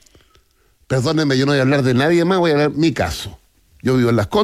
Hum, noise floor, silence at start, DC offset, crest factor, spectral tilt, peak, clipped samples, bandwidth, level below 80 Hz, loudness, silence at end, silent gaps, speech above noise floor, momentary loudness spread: none; -57 dBFS; 0.9 s; under 0.1%; 12 dB; -6 dB/octave; -6 dBFS; under 0.1%; 15 kHz; -44 dBFS; -16 LUFS; 0 s; none; 42 dB; 8 LU